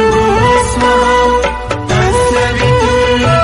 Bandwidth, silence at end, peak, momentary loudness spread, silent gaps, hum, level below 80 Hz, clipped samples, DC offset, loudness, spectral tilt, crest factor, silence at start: 12 kHz; 0 s; 0 dBFS; 5 LU; none; none; -24 dBFS; under 0.1%; under 0.1%; -11 LUFS; -5 dB/octave; 10 dB; 0 s